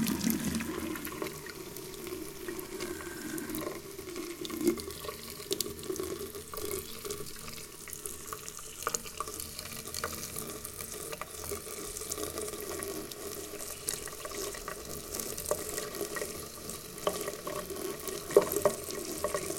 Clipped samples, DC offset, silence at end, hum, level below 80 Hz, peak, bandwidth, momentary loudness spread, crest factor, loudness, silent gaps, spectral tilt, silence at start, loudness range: under 0.1%; under 0.1%; 0 s; none; -58 dBFS; -8 dBFS; 17 kHz; 9 LU; 30 dB; -36 LUFS; none; -3 dB/octave; 0 s; 5 LU